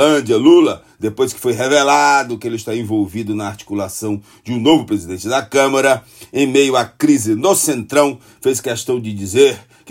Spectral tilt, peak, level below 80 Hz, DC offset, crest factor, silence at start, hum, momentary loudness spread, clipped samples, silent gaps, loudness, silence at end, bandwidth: -4 dB/octave; 0 dBFS; -58 dBFS; under 0.1%; 14 dB; 0 s; none; 12 LU; under 0.1%; none; -15 LUFS; 0.3 s; 16.5 kHz